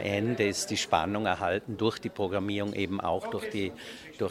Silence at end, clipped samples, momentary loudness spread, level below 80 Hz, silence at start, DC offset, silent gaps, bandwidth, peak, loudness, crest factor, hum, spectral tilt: 0 s; under 0.1%; 7 LU; -60 dBFS; 0 s; under 0.1%; none; 16 kHz; -10 dBFS; -30 LUFS; 22 dB; none; -4.5 dB/octave